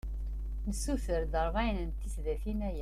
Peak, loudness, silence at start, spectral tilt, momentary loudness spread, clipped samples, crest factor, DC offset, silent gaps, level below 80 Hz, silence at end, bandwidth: -18 dBFS; -35 LUFS; 0.05 s; -5.5 dB/octave; 8 LU; under 0.1%; 14 dB; under 0.1%; none; -36 dBFS; 0 s; 13.5 kHz